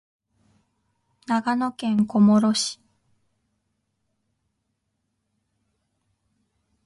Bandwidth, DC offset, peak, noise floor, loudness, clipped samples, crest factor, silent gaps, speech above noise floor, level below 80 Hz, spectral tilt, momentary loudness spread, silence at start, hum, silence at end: 11.5 kHz; under 0.1%; -8 dBFS; -76 dBFS; -21 LUFS; under 0.1%; 18 dB; none; 56 dB; -68 dBFS; -5 dB/octave; 10 LU; 1.3 s; none; 4.1 s